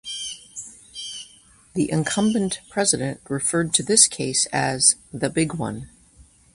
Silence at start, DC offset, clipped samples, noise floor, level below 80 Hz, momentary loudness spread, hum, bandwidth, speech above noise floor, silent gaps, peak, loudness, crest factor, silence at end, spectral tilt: 0.05 s; under 0.1%; under 0.1%; -53 dBFS; -54 dBFS; 18 LU; none; 11.5 kHz; 31 dB; none; 0 dBFS; -20 LUFS; 24 dB; 0.3 s; -3 dB/octave